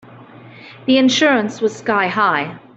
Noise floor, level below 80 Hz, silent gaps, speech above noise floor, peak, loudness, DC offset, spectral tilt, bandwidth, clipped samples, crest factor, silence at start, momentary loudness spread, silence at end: -40 dBFS; -64 dBFS; none; 24 dB; -2 dBFS; -16 LUFS; under 0.1%; -4 dB/octave; 8 kHz; under 0.1%; 16 dB; 0.2 s; 8 LU; 0.2 s